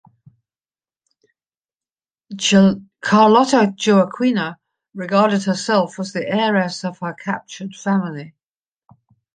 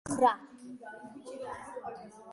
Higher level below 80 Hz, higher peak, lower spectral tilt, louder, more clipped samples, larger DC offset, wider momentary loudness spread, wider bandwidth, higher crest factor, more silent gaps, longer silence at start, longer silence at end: first, -62 dBFS vs -68 dBFS; first, -2 dBFS vs -12 dBFS; about the same, -5 dB/octave vs -4.5 dB/octave; first, -17 LUFS vs -34 LUFS; neither; neither; second, 15 LU vs 20 LU; second, 9.4 kHz vs 11.5 kHz; about the same, 18 dB vs 22 dB; neither; first, 2.3 s vs 0.05 s; first, 1.05 s vs 0 s